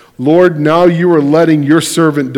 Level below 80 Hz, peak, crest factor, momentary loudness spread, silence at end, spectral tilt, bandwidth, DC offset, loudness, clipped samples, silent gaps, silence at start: -52 dBFS; 0 dBFS; 10 dB; 3 LU; 0 s; -6 dB/octave; 16.5 kHz; under 0.1%; -9 LUFS; 2%; none; 0.2 s